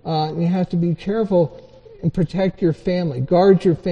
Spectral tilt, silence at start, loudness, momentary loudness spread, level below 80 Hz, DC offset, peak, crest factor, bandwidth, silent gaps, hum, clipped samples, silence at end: -9 dB/octave; 0.05 s; -19 LUFS; 8 LU; -44 dBFS; under 0.1%; -2 dBFS; 16 dB; 7 kHz; none; none; under 0.1%; 0 s